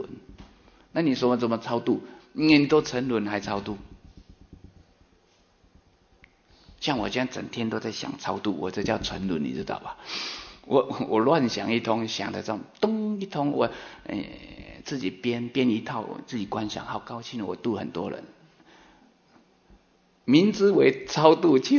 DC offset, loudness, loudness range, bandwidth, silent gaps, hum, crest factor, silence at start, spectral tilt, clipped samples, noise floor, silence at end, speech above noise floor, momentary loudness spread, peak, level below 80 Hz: under 0.1%; -26 LUFS; 10 LU; 7 kHz; none; none; 24 dB; 0 s; -5.5 dB/octave; under 0.1%; -63 dBFS; 0 s; 38 dB; 15 LU; -2 dBFS; -56 dBFS